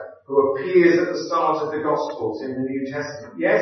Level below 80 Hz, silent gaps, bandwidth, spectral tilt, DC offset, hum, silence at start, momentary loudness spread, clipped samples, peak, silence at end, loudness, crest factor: -72 dBFS; none; 6.4 kHz; -6 dB/octave; under 0.1%; none; 0 s; 11 LU; under 0.1%; -4 dBFS; 0 s; -21 LUFS; 16 dB